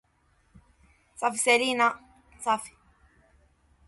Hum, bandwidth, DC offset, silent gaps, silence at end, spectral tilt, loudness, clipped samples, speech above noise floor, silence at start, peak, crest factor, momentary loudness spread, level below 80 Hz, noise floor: none; 12 kHz; under 0.1%; none; 1.2 s; -1 dB/octave; -26 LUFS; under 0.1%; 42 dB; 1.2 s; -8 dBFS; 22 dB; 16 LU; -64 dBFS; -67 dBFS